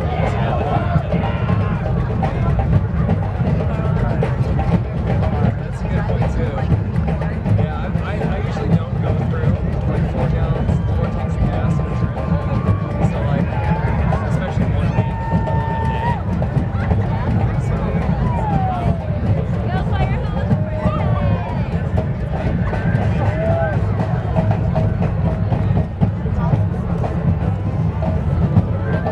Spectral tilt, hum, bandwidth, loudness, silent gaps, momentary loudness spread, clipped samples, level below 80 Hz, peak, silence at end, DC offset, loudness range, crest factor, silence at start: -9.5 dB/octave; none; 8.2 kHz; -19 LUFS; none; 3 LU; under 0.1%; -26 dBFS; -2 dBFS; 0 s; under 0.1%; 1 LU; 16 dB; 0 s